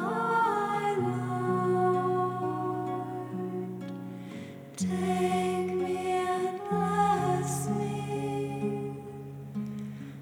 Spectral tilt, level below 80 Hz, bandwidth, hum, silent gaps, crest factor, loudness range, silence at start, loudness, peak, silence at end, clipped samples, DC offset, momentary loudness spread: -6.5 dB/octave; -72 dBFS; over 20 kHz; none; none; 16 dB; 4 LU; 0 s; -30 LUFS; -14 dBFS; 0 s; under 0.1%; under 0.1%; 13 LU